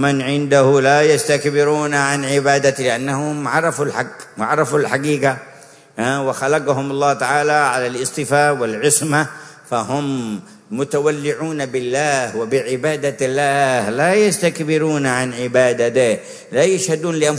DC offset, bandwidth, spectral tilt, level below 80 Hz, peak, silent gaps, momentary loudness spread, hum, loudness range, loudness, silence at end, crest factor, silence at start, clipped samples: under 0.1%; 11 kHz; -4.5 dB/octave; -62 dBFS; 0 dBFS; none; 9 LU; none; 4 LU; -17 LUFS; 0 s; 16 dB; 0 s; under 0.1%